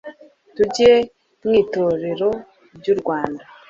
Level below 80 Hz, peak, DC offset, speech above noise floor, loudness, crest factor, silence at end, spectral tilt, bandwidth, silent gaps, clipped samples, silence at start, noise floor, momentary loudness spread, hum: -52 dBFS; -2 dBFS; under 0.1%; 24 dB; -19 LUFS; 18 dB; 0.25 s; -5 dB/octave; 7.6 kHz; none; under 0.1%; 0.05 s; -41 dBFS; 15 LU; none